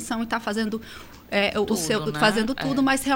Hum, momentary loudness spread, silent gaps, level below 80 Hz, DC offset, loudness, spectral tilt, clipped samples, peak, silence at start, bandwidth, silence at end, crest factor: none; 10 LU; none; -50 dBFS; under 0.1%; -24 LUFS; -4 dB/octave; under 0.1%; -6 dBFS; 0 s; 16.5 kHz; 0 s; 18 dB